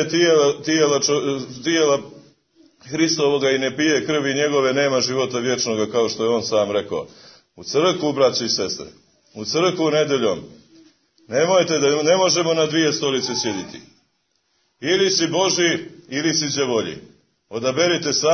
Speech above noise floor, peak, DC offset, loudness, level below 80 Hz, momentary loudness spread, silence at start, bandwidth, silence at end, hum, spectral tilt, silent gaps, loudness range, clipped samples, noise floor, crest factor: 49 dB; -4 dBFS; under 0.1%; -19 LUFS; -64 dBFS; 11 LU; 0 s; 6.6 kHz; 0 s; none; -3.5 dB/octave; none; 2 LU; under 0.1%; -68 dBFS; 16 dB